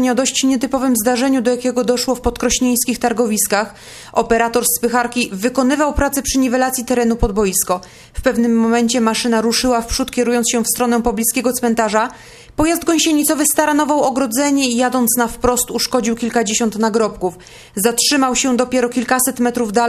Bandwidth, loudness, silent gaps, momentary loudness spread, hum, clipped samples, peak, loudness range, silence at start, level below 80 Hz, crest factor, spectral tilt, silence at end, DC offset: 14 kHz; -16 LUFS; none; 5 LU; none; under 0.1%; 0 dBFS; 2 LU; 0 s; -36 dBFS; 16 dB; -3 dB/octave; 0 s; under 0.1%